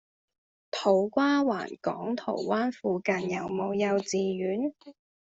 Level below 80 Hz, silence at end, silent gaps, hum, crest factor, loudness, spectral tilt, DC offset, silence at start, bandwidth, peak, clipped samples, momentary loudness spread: -72 dBFS; 0.35 s; none; none; 18 dB; -29 LUFS; -5.5 dB/octave; under 0.1%; 0.75 s; 8 kHz; -10 dBFS; under 0.1%; 8 LU